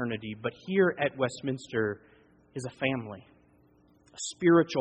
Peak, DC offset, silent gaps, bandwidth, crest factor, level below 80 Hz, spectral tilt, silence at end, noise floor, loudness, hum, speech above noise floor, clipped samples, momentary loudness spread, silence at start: -12 dBFS; under 0.1%; none; 8.8 kHz; 18 dB; -68 dBFS; -5.5 dB/octave; 0 s; -62 dBFS; -29 LUFS; none; 34 dB; under 0.1%; 19 LU; 0 s